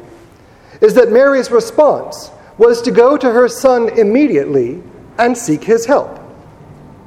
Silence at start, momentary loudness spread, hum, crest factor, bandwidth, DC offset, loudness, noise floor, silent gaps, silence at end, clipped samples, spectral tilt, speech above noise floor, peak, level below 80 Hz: 0.8 s; 12 LU; none; 12 dB; 15 kHz; under 0.1%; -12 LUFS; -42 dBFS; none; 0.75 s; 0.2%; -5 dB/octave; 31 dB; 0 dBFS; -50 dBFS